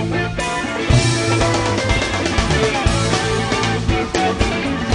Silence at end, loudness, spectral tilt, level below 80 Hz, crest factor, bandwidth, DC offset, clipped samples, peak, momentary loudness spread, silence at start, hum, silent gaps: 0 s; -17 LUFS; -4.5 dB/octave; -28 dBFS; 16 dB; 10.5 kHz; under 0.1%; under 0.1%; -2 dBFS; 5 LU; 0 s; none; none